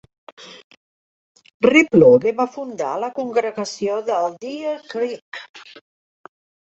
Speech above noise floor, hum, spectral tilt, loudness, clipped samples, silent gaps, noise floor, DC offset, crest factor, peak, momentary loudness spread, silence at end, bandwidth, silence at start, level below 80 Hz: over 72 dB; none; -5.5 dB/octave; -18 LUFS; under 0.1%; 0.64-0.70 s, 0.77-1.35 s, 1.54-1.60 s, 5.22-5.32 s, 5.49-5.54 s; under -90 dBFS; under 0.1%; 20 dB; 0 dBFS; 20 LU; 1 s; 8 kHz; 0.4 s; -62 dBFS